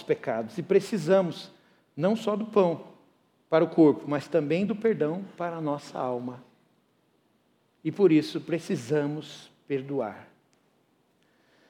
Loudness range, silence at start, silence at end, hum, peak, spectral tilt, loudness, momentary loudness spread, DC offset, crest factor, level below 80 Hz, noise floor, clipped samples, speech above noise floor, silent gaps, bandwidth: 6 LU; 0 s; 1.45 s; none; -10 dBFS; -7 dB/octave; -27 LUFS; 16 LU; under 0.1%; 18 dB; -80 dBFS; -68 dBFS; under 0.1%; 42 dB; none; 13.5 kHz